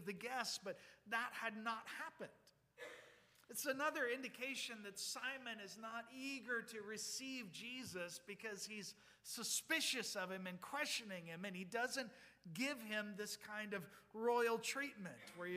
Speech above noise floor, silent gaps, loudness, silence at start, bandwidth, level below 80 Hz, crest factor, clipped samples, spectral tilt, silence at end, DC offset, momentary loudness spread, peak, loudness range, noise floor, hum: 21 dB; none; -45 LUFS; 0 s; 15.5 kHz; -88 dBFS; 20 dB; under 0.1%; -2 dB/octave; 0 s; under 0.1%; 14 LU; -26 dBFS; 4 LU; -67 dBFS; none